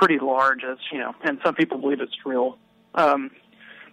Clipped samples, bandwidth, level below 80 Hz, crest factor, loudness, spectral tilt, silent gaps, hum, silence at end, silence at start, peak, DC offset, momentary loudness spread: under 0.1%; 12 kHz; -70 dBFS; 16 dB; -23 LUFS; -5.5 dB/octave; none; none; 0.1 s; 0 s; -8 dBFS; under 0.1%; 10 LU